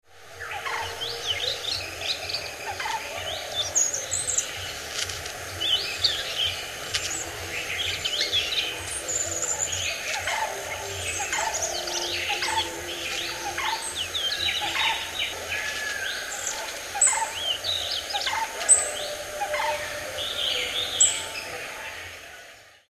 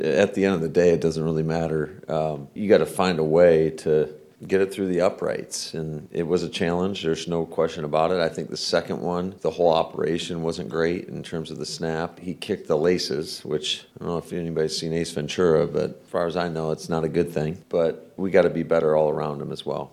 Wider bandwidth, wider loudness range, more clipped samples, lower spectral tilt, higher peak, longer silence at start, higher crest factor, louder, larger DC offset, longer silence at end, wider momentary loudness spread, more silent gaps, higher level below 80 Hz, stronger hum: about the same, 14 kHz vs 14 kHz; about the same, 4 LU vs 5 LU; neither; second, 0.5 dB/octave vs -5.5 dB/octave; about the same, -4 dBFS vs -4 dBFS; about the same, 0.1 s vs 0 s; about the same, 24 dB vs 20 dB; about the same, -26 LUFS vs -24 LUFS; neither; about the same, 0.15 s vs 0.05 s; about the same, 10 LU vs 10 LU; neither; about the same, -54 dBFS vs -54 dBFS; neither